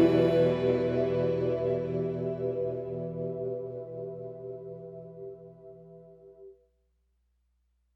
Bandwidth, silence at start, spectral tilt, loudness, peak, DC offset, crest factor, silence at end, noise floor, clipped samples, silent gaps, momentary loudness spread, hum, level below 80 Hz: 7.4 kHz; 0 s; -9 dB/octave; -30 LUFS; -12 dBFS; under 0.1%; 18 dB; 1.45 s; -73 dBFS; under 0.1%; none; 20 LU; 60 Hz at -60 dBFS; -60 dBFS